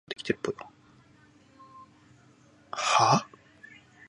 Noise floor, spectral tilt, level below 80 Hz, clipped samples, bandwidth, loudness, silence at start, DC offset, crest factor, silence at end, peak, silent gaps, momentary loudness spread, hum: -59 dBFS; -3.5 dB/octave; -70 dBFS; under 0.1%; 11.5 kHz; -27 LUFS; 0.1 s; under 0.1%; 24 dB; 0.85 s; -8 dBFS; none; 27 LU; none